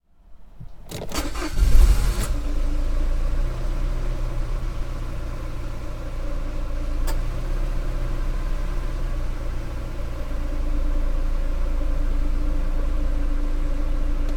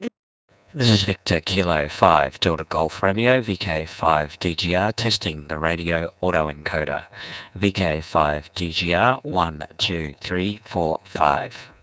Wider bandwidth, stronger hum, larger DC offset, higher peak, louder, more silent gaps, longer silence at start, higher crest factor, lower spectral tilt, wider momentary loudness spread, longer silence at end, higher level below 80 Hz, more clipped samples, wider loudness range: first, 14.5 kHz vs 8 kHz; neither; neither; about the same, -2 dBFS vs 0 dBFS; second, -29 LUFS vs -21 LUFS; second, none vs 0.19-0.48 s; first, 0.3 s vs 0 s; about the same, 20 dB vs 22 dB; about the same, -5.5 dB/octave vs -5 dB/octave; about the same, 7 LU vs 9 LU; second, 0 s vs 0.15 s; first, -22 dBFS vs -40 dBFS; neither; about the same, 6 LU vs 4 LU